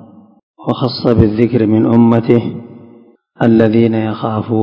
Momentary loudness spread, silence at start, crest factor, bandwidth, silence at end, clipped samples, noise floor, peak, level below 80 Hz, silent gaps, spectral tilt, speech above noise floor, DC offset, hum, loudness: 10 LU; 0.6 s; 12 dB; 5.4 kHz; 0 s; 0.6%; -44 dBFS; 0 dBFS; -34 dBFS; none; -10 dB/octave; 32 dB; under 0.1%; none; -12 LUFS